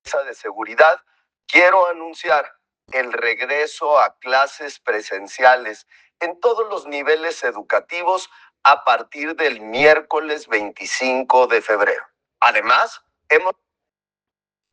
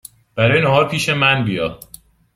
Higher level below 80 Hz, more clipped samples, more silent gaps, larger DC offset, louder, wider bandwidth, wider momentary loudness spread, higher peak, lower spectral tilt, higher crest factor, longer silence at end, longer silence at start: second, -70 dBFS vs -48 dBFS; neither; neither; neither; about the same, -18 LUFS vs -16 LUFS; second, 9.6 kHz vs 16 kHz; about the same, 12 LU vs 10 LU; about the same, 0 dBFS vs -2 dBFS; second, -2 dB/octave vs -5 dB/octave; about the same, 18 dB vs 16 dB; first, 1.2 s vs 0.6 s; second, 0.05 s vs 0.35 s